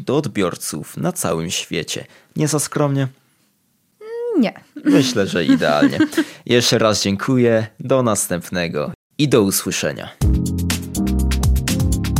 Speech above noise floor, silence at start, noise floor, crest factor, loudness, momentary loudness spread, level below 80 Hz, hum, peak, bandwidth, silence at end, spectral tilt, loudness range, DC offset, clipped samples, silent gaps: 45 dB; 0 s; -63 dBFS; 18 dB; -18 LUFS; 9 LU; -30 dBFS; none; 0 dBFS; 16.5 kHz; 0 s; -5 dB/octave; 6 LU; under 0.1%; under 0.1%; 8.95-9.10 s